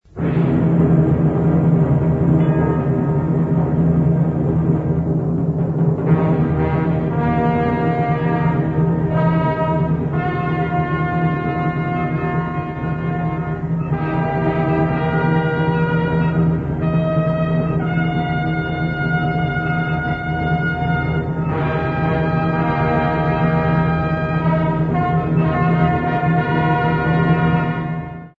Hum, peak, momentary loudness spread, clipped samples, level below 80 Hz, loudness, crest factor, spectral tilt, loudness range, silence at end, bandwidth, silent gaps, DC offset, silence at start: none; -4 dBFS; 5 LU; under 0.1%; -36 dBFS; -18 LUFS; 14 dB; -10 dB/octave; 3 LU; 0.1 s; 4.5 kHz; none; under 0.1%; 0.15 s